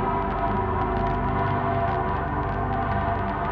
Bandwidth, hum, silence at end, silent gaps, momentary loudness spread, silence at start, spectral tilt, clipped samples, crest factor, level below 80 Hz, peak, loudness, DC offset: 5.4 kHz; none; 0 s; none; 2 LU; 0 s; -9.5 dB/octave; under 0.1%; 12 dB; -34 dBFS; -12 dBFS; -25 LUFS; under 0.1%